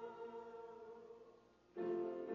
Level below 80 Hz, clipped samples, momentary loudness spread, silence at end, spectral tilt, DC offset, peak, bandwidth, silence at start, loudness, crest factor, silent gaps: -86 dBFS; under 0.1%; 19 LU; 0 s; -6 dB/octave; under 0.1%; -34 dBFS; 6.8 kHz; 0 s; -49 LUFS; 14 dB; none